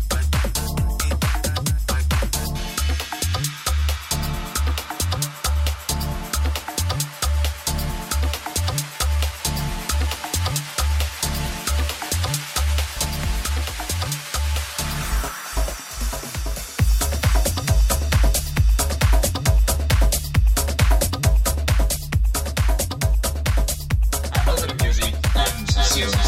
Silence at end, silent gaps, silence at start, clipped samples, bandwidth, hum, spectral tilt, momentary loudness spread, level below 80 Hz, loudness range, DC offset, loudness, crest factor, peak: 0 s; none; 0 s; under 0.1%; 16.5 kHz; none; -3.5 dB/octave; 6 LU; -22 dBFS; 4 LU; under 0.1%; -22 LUFS; 16 dB; -6 dBFS